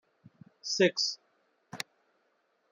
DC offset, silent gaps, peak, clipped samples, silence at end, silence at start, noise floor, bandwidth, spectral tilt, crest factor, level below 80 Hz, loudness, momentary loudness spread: under 0.1%; none; -12 dBFS; under 0.1%; 0.9 s; 0.65 s; -74 dBFS; 13 kHz; -3 dB/octave; 22 dB; -84 dBFS; -29 LUFS; 18 LU